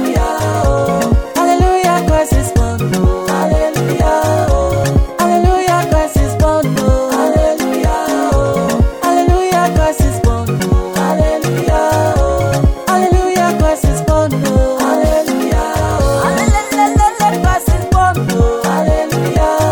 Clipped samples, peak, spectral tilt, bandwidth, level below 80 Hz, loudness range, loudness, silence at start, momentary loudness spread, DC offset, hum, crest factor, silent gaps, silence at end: under 0.1%; 0 dBFS; -6 dB/octave; 19.5 kHz; -18 dBFS; 1 LU; -13 LUFS; 0 s; 3 LU; under 0.1%; none; 10 dB; none; 0 s